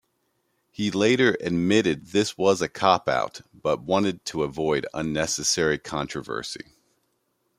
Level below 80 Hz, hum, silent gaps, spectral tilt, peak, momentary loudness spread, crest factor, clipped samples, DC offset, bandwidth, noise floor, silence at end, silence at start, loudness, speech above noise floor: -56 dBFS; none; none; -4 dB/octave; -4 dBFS; 10 LU; 22 dB; under 0.1%; under 0.1%; 15.5 kHz; -72 dBFS; 1 s; 0.8 s; -24 LUFS; 48 dB